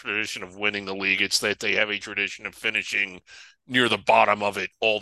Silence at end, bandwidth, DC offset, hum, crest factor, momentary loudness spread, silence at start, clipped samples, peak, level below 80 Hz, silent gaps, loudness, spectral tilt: 0 s; 12.5 kHz; under 0.1%; none; 22 dB; 9 LU; 0.05 s; under 0.1%; -4 dBFS; -62 dBFS; none; -23 LUFS; -2.5 dB/octave